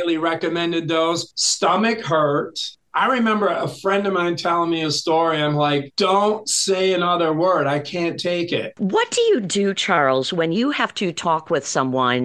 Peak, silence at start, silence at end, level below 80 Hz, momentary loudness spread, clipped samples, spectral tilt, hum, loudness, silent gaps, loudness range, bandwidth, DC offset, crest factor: -2 dBFS; 0 s; 0 s; -64 dBFS; 5 LU; under 0.1%; -4 dB/octave; none; -20 LUFS; none; 1 LU; 12.5 kHz; under 0.1%; 18 dB